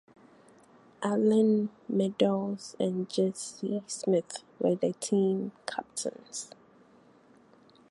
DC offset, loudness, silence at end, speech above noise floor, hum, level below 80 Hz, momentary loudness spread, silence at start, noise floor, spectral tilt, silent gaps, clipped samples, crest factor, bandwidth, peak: under 0.1%; -30 LUFS; 1.45 s; 30 dB; none; -78 dBFS; 12 LU; 1 s; -60 dBFS; -5.5 dB/octave; none; under 0.1%; 18 dB; 11.5 kHz; -12 dBFS